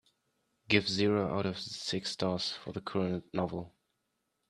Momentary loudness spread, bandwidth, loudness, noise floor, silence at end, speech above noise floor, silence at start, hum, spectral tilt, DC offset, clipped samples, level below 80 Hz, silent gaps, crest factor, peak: 9 LU; 12 kHz; -33 LUFS; -82 dBFS; 0.8 s; 49 dB; 0.7 s; none; -5 dB/octave; under 0.1%; under 0.1%; -66 dBFS; none; 26 dB; -10 dBFS